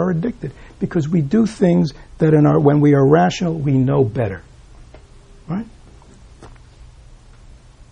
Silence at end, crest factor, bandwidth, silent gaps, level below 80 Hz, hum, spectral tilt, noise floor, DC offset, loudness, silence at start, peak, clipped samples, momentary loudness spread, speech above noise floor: 0.75 s; 16 dB; 9.4 kHz; none; -44 dBFS; none; -8 dB/octave; -43 dBFS; under 0.1%; -16 LUFS; 0 s; -2 dBFS; under 0.1%; 15 LU; 27 dB